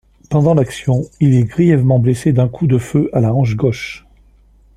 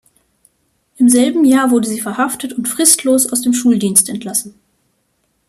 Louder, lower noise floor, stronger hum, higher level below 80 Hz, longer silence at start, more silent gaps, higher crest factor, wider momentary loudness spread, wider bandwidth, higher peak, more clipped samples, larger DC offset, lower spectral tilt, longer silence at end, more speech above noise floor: about the same, -14 LUFS vs -13 LUFS; second, -48 dBFS vs -64 dBFS; neither; first, -42 dBFS vs -58 dBFS; second, 0.3 s vs 1 s; neither; about the same, 14 dB vs 16 dB; second, 6 LU vs 9 LU; second, 11.5 kHz vs 15.5 kHz; about the same, 0 dBFS vs 0 dBFS; neither; neither; first, -8 dB/octave vs -3 dB/octave; second, 0.8 s vs 1 s; second, 35 dB vs 50 dB